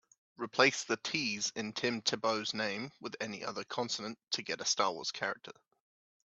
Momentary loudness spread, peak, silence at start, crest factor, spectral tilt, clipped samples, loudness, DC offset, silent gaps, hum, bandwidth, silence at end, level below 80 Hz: 12 LU; -10 dBFS; 0.4 s; 26 dB; -2 dB/octave; under 0.1%; -34 LUFS; under 0.1%; none; none; 8.4 kHz; 0.7 s; -80 dBFS